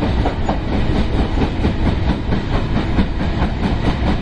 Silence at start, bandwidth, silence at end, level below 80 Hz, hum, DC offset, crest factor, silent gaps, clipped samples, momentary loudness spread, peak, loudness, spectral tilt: 0 s; 9 kHz; 0 s; -20 dBFS; none; under 0.1%; 16 dB; none; under 0.1%; 2 LU; 0 dBFS; -19 LUFS; -7.5 dB/octave